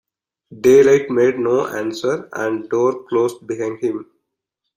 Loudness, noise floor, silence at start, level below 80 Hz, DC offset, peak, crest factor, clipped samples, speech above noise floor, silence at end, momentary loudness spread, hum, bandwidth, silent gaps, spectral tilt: -17 LUFS; -78 dBFS; 0.5 s; -60 dBFS; under 0.1%; -2 dBFS; 16 dB; under 0.1%; 62 dB; 0.75 s; 12 LU; none; 15.5 kHz; none; -5.5 dB/octave